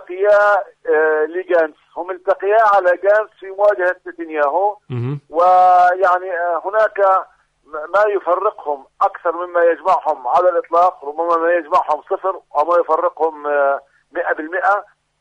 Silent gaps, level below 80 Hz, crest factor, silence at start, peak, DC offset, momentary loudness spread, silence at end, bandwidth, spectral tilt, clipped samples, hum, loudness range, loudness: none; -64 dBFS; 12 dB; 0 s; -4 dBFS; under 0.1%; 11 LU; 0.4 s; 8.4 kHz; -7 dB/octave; under 0.1%; none; 3 LU; -16 LUFS